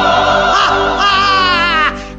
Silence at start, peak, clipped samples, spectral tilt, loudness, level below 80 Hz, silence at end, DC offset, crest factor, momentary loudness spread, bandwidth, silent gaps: 0 s; 0 dBFS; under 0.1%; -3 dB/octave; -10 LUFS; -32 dBFS; 0 s; 0.2%; 12 dB; 2 LU; 8.4 kHz; none